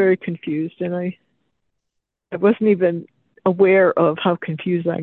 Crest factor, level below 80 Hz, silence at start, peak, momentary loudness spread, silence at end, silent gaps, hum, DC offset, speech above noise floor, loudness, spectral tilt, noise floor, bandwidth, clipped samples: 16 dB; -66 dBFS; 0 s; -4 dBFS; 11 LU; 0 s; none; none; under 0.1%; 60 dB; -19 LUFS; -10.5 dB/octave; -78 dBFS; 4.1 kHz; under 0.1%